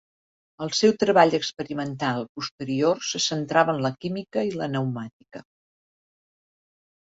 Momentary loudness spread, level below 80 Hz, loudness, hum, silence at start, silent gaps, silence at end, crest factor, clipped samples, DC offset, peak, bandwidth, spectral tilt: 16 LU; -66 dBFS; -24 LUFS; none; 0.6 s; 2.29-2.35 s, 2.51-2.58 s, 5.13-5.20 s; 1.7 s; 22 dB; under 0.1%; under 0.1%; -4 dBFS; 8 kHz; -4.5 dB/octave